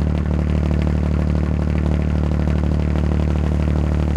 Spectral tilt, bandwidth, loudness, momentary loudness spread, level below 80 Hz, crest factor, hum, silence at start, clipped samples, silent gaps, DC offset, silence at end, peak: -9 dB/octave; 7.4 kHz; -19 LUFS; 1 LU; -22 dBFS; 14 dB; none; 0 s; under 0.1%; none; under 0.1%; 0 s; -4 dBFS